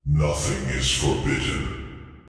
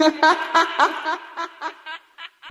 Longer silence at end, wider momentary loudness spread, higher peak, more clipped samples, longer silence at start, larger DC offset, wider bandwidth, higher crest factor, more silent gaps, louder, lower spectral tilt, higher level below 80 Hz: about the same, 0.1 s vs 0 s; second, 12 LU vs 20 LU; second, -8 dBFS vs -2 dBFS; neither; about the same, 0.05 s vs 0 s; neither; second, 11 kHz vs 12.5 kHz; about the same, 16 dB vs 20 dB; neither; second, -24 LUFS vs -20 LUFS; first, -4 dB/octave vs -1 dB/octave; first, -32 dBFS vs -72 dBFS